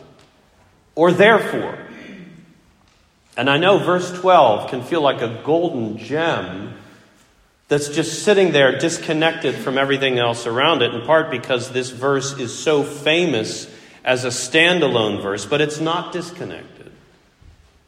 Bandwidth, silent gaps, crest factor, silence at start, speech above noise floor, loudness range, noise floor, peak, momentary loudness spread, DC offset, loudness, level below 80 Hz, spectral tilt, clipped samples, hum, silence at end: 15.5 kHz; none; 18 dB; 0.95 s; 38 dB; 3 LU; -56 dBFS; 0 dBFS; 17 LU; under 0.1%; -18 LUFS; -60 dBFS; -4 dB/octave; under 0.1%; none; 1.05 s